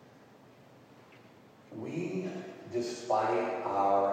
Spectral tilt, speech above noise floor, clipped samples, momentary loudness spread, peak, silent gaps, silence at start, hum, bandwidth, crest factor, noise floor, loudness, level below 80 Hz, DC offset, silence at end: -6 dB/octave; 27 dB; under 0.1%; 14 LU; -16 dBFS; none; 0.05 s; none; 14.5 kHz; 18 dB; -57 dBFS; -33 LUFS; -84 dBFS; under 0.1%; 0 s